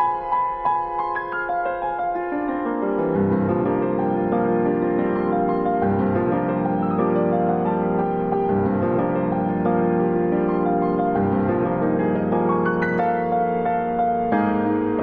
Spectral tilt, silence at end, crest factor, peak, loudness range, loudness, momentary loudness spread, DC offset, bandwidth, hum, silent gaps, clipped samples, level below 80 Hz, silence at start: -8 dB/octave; 0 s; 14 dB; -8 dBFS; 2 LU; -21 LUFS; 4 LU; under 0.1%; 4.6 kHz; none; none; under 0.1%; -50 dBFS; 0 s